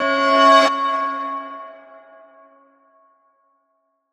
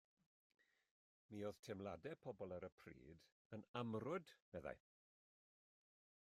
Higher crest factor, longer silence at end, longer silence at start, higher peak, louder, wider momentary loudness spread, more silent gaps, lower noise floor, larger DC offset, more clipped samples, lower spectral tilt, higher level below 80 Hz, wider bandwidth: about the same, 20 dB vs 22 dB; first, 2.35 s vs 1.4 s; second, 0 s vs 1.3 s; first, -2 dBFS vs -32 dBFS; first, -16 LUFS vs -53 LUFS; first, 23 LU vs 15 LU; second, none vs 1.59-1.63 s, 2.72-2.78 s, 3.32-3.50 s, 3.68-3.74 s, 4.42-4.52 s; second, -69 dBFS vs under -90 dBFS; neither; neither; second, -1.5 dB/octave vs -6.5 dB/octave; about the same, -80 dBFS vs -82 dBFS; second, 11.5 kHz vs 15 kHz